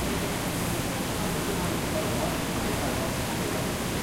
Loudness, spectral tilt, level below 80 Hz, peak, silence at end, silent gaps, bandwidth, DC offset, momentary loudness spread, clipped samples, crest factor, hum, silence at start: -28 LUFS; -4 dB/octave; -42 dBFS; -16 dBFS; 0 s; none; 16 kHz; under 0.1%; 1 LU; under 0.1%; 14 dB; none; 0 s